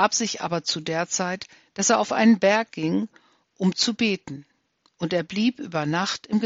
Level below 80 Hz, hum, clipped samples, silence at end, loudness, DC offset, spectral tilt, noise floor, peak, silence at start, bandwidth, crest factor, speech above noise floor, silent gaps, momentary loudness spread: -68 dBFS; none; under 0.1%; 0 s; -23 LUFS; under 0.1%; -3.5 dB/octave; -67 dBFS; -6 dBFS; 0 s; 8 kHz; 18 dB; 43 dB; none; 13 LU